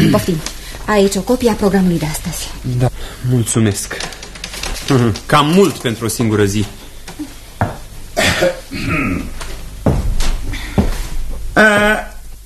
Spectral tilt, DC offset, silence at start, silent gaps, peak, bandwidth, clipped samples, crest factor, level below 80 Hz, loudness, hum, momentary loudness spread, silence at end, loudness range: -5 dB/octave; under 0.1%; 0 s; none; 0 dBFS; 13.5 kHz; under 0.1%; 16 dB; -26 dBFS; -16 LUFS; none; 16 LU; 0 s; 3 LU